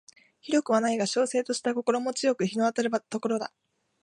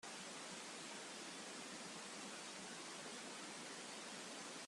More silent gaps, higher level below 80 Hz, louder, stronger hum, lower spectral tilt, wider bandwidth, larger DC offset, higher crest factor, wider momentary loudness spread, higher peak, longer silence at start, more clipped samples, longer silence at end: neither; first, -80 dBFS vs under -90 dBFS; first, -27 LUFS vs -50 LUFS; neither; first, -4 dB/octave vs -1.5 dB/octave; second, 11.5 kHz vs 13 kHz; neither; about the same, 18 dB vs 14 dB; first, 6 LU vs 0 LU; first, -10 dBFS vs -38 dBFS; first, 0.45 s vs 0 s; neither; first, 0.55 s vs 0 s